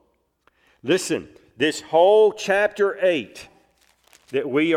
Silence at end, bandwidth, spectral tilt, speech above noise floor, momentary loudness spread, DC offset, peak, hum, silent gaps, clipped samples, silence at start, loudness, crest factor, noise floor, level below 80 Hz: 0 s; 14.5 kHz; -4 dB/octave; 45 dB; 13 LU; under 0.1%; -6 dBFS; none; none; under 0.1%; 0.85 s; -20 LUFS; 16 dB; -65 dBFS; -66 dBFS